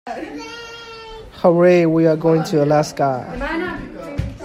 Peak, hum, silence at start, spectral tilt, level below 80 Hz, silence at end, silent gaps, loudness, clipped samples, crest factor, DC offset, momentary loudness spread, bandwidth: 0 dBFS; none; 0.05 s; -7 dB/octave; -40 dBFS; 0 s; none; -17 LUFS; under 0.1%; 18 dB; under 0.1%; 20 LU; 13.5 kHz